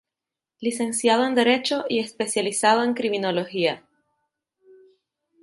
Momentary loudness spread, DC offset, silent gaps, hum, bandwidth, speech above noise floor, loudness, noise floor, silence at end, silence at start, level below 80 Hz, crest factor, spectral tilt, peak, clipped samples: 7 LU; under 0.1%; none; none; 11.5 kHz; 66 dB; -22 LUFS; -88 dBFS; 1.65 s; 0.6 s; -74 dBFS; 20 dB; -3 dB/octave; -6 dBFS; under 0.1%